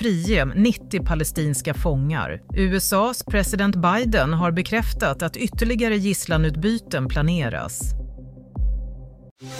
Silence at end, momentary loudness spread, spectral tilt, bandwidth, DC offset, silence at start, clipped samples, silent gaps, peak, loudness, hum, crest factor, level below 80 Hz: 0 s; 10 LU; -5 dB/octave; 16 kHz; under 0.1%; 0 s; under 0.1%; 9.31-9.36 s; -6 dBFS; -22 LUFS; none; 16 dB; -30 dBFS